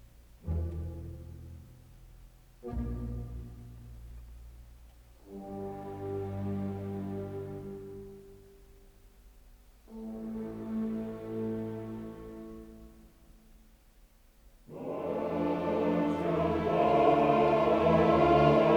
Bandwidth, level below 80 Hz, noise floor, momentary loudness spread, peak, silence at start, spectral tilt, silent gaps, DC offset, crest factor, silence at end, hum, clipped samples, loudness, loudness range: over 20 kHz; -50 dBFS; -60 dBFS; 25 LU; -10 dBFS; 0.4 s; -8 dB/octave; none; under 0.1%; 22 dB; 0 s; none; under 0.1%; -31 LUFS; 17 LU